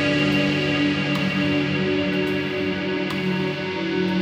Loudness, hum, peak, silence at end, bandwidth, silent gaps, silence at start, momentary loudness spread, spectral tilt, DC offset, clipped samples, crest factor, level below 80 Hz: -22 LUFS; none; -8 dBFS; 0 s; 13 kHz; none; 0 s; 5 LU; -6 dB/octave; under 0.1%; under 0.1%; 14 dB; -50 dBFS